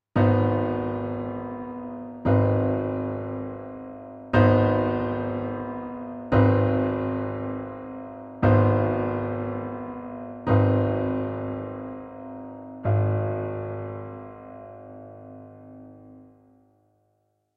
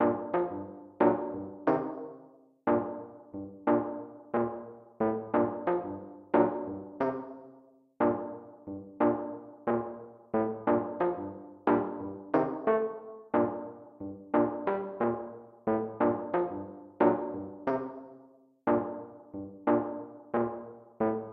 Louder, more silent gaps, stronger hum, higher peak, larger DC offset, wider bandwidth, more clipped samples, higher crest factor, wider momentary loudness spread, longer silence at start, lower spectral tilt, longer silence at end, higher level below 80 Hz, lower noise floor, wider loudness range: first, -25 LUFS vs -31 LUFS; neither; neither; first, -6 dBFS vs -10 dBFS; neither; first, 4.9 kHz vs 4.1 kHz; neither; about the same, 20 dB vs 22 dB; first, 21 LU vs 15 LU; first, 0.15 s vs 0 s; first, -11 dB/octave vs -7.5 dB/octave; first, 1.35 s vs 0 s; first, -50 dBFS vs -68 dBFS; first, -71 dBFS vs -59 dBFS; first, 10 LU vs 2 LU